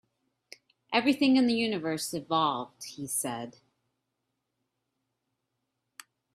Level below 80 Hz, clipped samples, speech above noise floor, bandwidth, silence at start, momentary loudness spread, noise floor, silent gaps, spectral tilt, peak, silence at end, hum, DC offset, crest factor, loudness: -74 dBFS; under 0.1%; 54 dB; 15.5 kHz; 0.9 s; 16 LU; -83 dBFS; none; -3.5 dB/octave; -10 dBFS; 2.85 s; none; under 0.1%; 22 dB; -28 LUFS